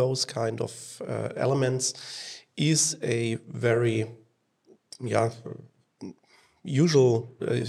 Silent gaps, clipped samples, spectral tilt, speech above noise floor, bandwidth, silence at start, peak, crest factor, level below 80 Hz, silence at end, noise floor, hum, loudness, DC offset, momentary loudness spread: none; under 0.1%; -4.5 dB/octave; 35 dB; 13.5 kHz; 0 s; -8 dBFS; 20 dB; -72 dBFS; 0 s; -62 dBFS; none; -26 LUFS; under 0.1%; 20 LU